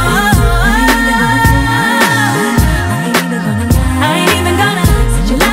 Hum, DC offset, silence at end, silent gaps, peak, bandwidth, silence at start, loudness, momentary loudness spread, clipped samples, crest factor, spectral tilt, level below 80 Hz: none; under 0.1%; 0 s; none; 0 dBFS; 16.5 kHz; 0 s; -11 LUFS; 4 LU; under 0.1%; 10 dB; -4.5 dB/octave; -18 dBFS